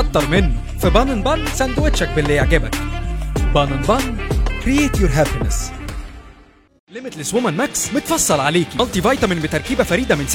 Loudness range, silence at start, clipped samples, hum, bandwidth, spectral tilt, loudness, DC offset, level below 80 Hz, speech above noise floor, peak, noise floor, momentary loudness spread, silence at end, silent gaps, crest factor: 3 LU; 0 s; under 0.1%; none; 17 kHz; -4.5 dB/octave; -18 LUFS; under 0.1%; -24 dBFS; 30 dB; 0 dBFS; -46 dBFS; 9 LU; 0 s; 6.80-6.87 s; 18 dB